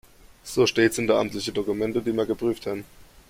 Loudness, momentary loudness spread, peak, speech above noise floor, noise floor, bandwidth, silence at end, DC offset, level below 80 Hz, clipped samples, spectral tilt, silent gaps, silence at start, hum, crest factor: -24 LUFS; 11 LU; -6 dBFS; 20 dB; -44 dBFS; 16.5 kHz; 0.25 s; under 0.1%; -54 dBFS; under 0.1%; -4.5 dB/octave; none; 0.45 s; none; 18 dB